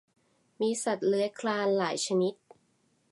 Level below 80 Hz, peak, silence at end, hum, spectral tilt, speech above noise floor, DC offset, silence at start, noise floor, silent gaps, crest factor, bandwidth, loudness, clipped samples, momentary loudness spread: -84 dBFS; -16 dBFS; 0.8 s; none; -4 dB/octave; 42 dB; under 0.1%; 0.6 s; -71 dBFS; none; 16 dB; 11.5 kHz; -29 LUFS; under 0.1%; 4 LU